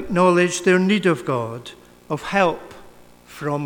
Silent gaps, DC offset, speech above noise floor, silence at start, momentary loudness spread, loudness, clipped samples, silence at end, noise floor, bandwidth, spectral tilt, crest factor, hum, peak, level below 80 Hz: none; under 0.1%; 26 dB; 0 s; 16 LU; -20 LUFS; under 0.1%; 0 s; -46 dBFS; 18 kHz; -5.5 dB/octave; 18 dB; 60 Hz at -50 dBFS; -2 dBFS; -52 dBFS